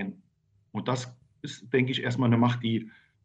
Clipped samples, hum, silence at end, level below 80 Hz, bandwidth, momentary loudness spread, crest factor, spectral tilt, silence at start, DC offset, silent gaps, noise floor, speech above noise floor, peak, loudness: under 0.1%; none; 0.35 s; -70 dBFS; 8.4 kHz; 19 LU; 18 dB; -6.5 dB/octave; 0 s; under 0.1%; none; -68 dBFS; 41 dB; -12 dBFS; -28 LUFS